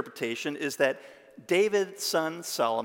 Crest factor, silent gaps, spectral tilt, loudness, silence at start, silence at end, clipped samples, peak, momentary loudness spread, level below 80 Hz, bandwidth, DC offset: 20 dB; none; -3 dB/octave; -28 LUFS; 0 s; 0 s; under 0.1%; -10 dBFS; 8 LU; -84 dBFS; 17 kHz; under 0.1%